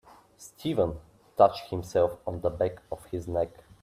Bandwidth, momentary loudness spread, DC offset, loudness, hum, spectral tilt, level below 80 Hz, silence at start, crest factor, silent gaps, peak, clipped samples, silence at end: 15 kHz; 17 LU; under 0.1%; -29 LUFS; none; -6.5 dB/octave; -54 dBFS; 0.4 s; 22 dB; none; -6 dBFS; under 0.1%; 0.35 s